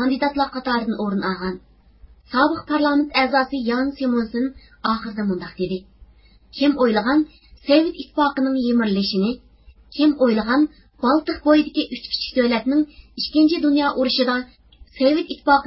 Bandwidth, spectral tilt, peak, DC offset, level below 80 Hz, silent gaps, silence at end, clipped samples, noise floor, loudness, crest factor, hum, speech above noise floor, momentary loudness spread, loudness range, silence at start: 5.8 kHz; -9.5 dB/octave; -2 dBFS; under 0.1%; -50 dBFS; none; 0 s; under 0.1%; -49 dBFS; -20 LUFS; 18 dB; none; 30 dB; 10 LU; 3 LU; 0 s